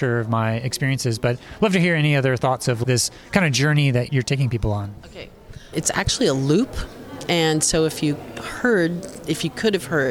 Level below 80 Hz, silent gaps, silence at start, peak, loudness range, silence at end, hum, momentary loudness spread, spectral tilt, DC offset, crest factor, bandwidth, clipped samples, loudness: -40 dBFS; none; 0 s; -2 dBFS; 3 LU; 0 s; none; 13 LU; -4.5 dB/octave; under 0.1%; 18 dB; 16.5 kHz; under 0.1%; -21 LUFS